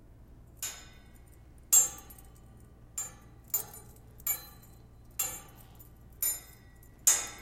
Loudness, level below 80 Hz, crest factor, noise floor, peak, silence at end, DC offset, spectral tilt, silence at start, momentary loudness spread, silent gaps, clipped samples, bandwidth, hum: -30 LUFS; -56 dBFS; 28 dB; -54 dBFS; -8 dBFS; 0 s; under 0.1%; 0 dB/octave; 0.4 s; 25 LU; none; under 0.1%; 17 kHz; none